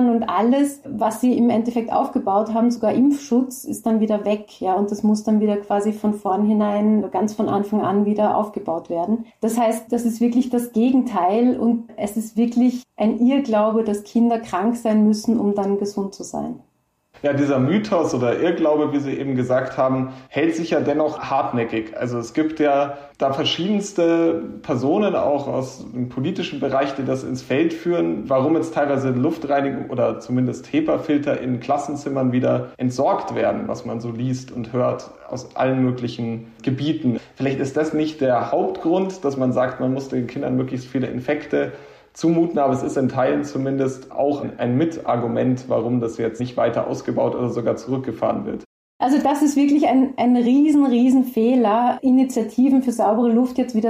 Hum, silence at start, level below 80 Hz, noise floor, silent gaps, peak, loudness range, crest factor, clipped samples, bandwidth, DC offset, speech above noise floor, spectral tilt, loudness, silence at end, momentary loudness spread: none; 0 s; -58 dBFS; -56 dBFS; 48.66-49.00 s; -8 dBFS; 5 LU; 10 dB; under 0.1%; 15 kHz; under 0.1%; 36 dB; -6.5 dB/octave; -20 LUFS; 0 s; 8 LU